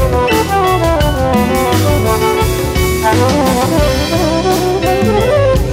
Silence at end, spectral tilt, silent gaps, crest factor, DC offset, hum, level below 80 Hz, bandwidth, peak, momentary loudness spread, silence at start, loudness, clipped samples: 0 s; -5.5 dB/octave; none; 12 dB; under 0.1%; none; -22 dBFS; 16.5 kHz; 0 dBFS; 2 LU; 0 s; -12 LUFS; under 0.1%